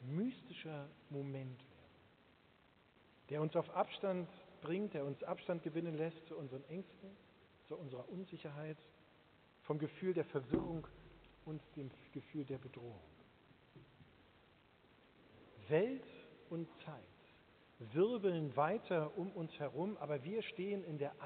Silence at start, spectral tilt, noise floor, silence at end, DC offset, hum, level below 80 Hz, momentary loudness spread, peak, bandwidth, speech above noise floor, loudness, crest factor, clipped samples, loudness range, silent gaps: 0 s; -6 dB/octave; -70 dBFS; 0 s; under 0.1%; none; -74 dBFS; 20 LU; -22 dBFS; 4.5 kHz; 28 dB; -43 LUFS; 22 dB; under 0.1%; 12 LU; none